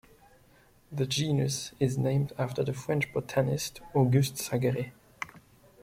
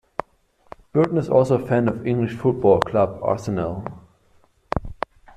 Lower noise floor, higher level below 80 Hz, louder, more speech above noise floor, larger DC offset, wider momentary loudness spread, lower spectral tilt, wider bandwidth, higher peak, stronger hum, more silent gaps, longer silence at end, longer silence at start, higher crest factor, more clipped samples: about the same, -61 dBFS vs -59 dBFS; second, -60 dBFS vs -44 dBFS; second, -29 LUFS vs -21 LUFS; second, 32 dB vs 39 dB; neither; about the same, 15 LU vs 15 LU; second, -5.5 dB/octave vs -8.5 dB/octave; first, 16 kHz vs 10.5 kHz; second, -12 dBFS vs 0 dBFS; neither; neither; about the same, 0.45 s vs 0.45 s; about the same, 0.9 s vs 0.95 s; about the same, 18 dB vs 22 dB; neither